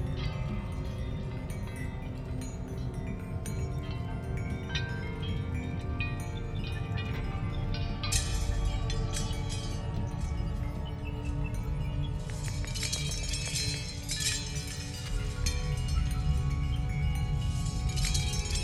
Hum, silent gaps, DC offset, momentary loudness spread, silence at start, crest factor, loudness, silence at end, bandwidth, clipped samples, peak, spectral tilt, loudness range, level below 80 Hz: none; none; under 0.1%; 7 LU; 0 s; 18 dB; -34 LUFS; 0 s; 13.5 kHz; under 0.1%; -14 dBFS; -4.5 dB/octave; 5 LU; -36 dBFS